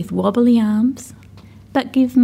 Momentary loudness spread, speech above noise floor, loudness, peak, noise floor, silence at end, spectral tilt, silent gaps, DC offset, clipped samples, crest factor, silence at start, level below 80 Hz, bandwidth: 14 LU; 26 dB; -17 LUFS; -4 dBFS; -41 dBFS; 0 s; -7 dB/octave; none; under 0.1%; under 0.1%; 14 dB; 0 s; -52 dBFS; 15 kHz